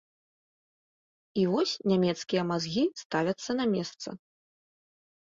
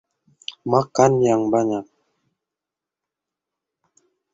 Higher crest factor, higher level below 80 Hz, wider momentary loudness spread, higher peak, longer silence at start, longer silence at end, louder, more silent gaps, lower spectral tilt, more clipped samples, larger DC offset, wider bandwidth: about the same, 18 dB vs 22 dB; second, -70 dBFS vs -62 dBFS; second, 11 LU vs 17 LU; second, -14 dBFS vs -2 dBFS; first, 1.35 s vs 0.5 s; second, 1.05 s vs 2.5 s; second, -29 LUFS vs -19 LUFS; first, 3.05-3.10 s vs none; about the same, -5.5 dB/octave vs -6 dB/octave; neither; neither; about the same, 7.8 kHz vs 7.8 kHz